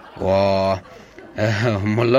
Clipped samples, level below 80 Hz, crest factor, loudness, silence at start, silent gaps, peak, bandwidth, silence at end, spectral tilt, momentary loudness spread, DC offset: under 0.1%; -52 dBFS; 18 dB; -20 LUFS; 0.05 s; none; -2 dBFS; 11.5 kHz; 0 s; -7 dB/octave; 8 LU; under 0.1%